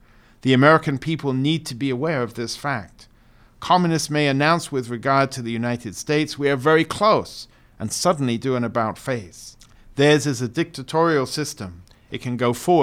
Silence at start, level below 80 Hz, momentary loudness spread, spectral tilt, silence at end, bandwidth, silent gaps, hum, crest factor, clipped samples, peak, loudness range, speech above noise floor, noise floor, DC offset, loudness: 0.45 s; -54 dBFS; 13 LU; -5 dB/octave; 0 s; 16 kHz; none; none; 20 dB; under 0.1%; -2 dBFS; 2 LU; 31 dB; -52 dBFS; under 0.1%; -21 LUFS